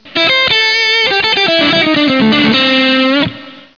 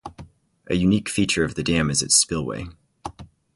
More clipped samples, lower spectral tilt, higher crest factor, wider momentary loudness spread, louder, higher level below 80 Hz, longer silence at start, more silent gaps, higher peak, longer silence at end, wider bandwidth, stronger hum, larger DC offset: neither; about the same, -4 dB/octave vs -3.5 dB/octave; second, 10 dB vs 20 dB; second, 2 LU vs 22 LU; first, -9 LUFS vs -21 LUFS; about the same, -48 dBFS vs -44 dBFS; about the same, 0.05 s vs 0.05 s; neither; about the same, -2 dBFS vs -4 dBFS; second, 0.15 s vs 0.3 s; second, 5.4 kHz vs 11.5 kHz; neither; first, 0.4% vs under 0.1%